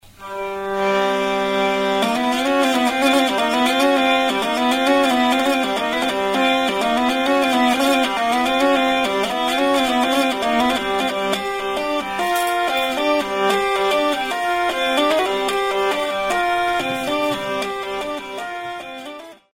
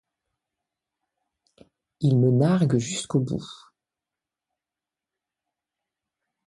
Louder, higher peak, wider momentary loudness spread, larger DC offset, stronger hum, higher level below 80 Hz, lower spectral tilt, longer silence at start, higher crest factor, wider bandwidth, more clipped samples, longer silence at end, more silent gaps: first, -19 LUFS vs -23 LUFS; first, -4 dBFS vs -8 dBFS; second, 8 LU vs 12 LU; neither; neither; first, -50 dBFS vs -62 dBFS; second, -3 dB/octave vs -7 dB/octave; second, 0.2 s vs 2 s; second, 14 dB vs 20 dB; first, 16.5 kHz vs 11.5 kHz; neither; second, 0.2 s vs 2.9 s; neither